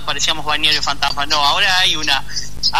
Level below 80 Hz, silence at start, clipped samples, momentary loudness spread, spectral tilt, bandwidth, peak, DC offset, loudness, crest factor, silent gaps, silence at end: -36 dBFS; 0 s; under 0.1%; 6 LU; -0.5 dB/octave; 13.5 kHz; -2 dBFS; 8%; -15 LUFS; 16 dB; none; 0 s